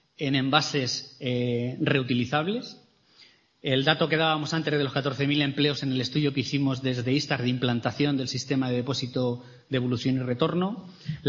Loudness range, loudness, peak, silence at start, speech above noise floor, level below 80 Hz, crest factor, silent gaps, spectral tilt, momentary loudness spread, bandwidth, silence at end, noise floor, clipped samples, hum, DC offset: 2 LU; -26 LUFS; -4 dBFS; 0.2 s; 31 dB; -64 dBFS; 22 dB; none; -5.5 dB/octave; 7 LU; 7.4 kHz; 0 s; -58 dBFS; under 0.1%; none; under 0.1%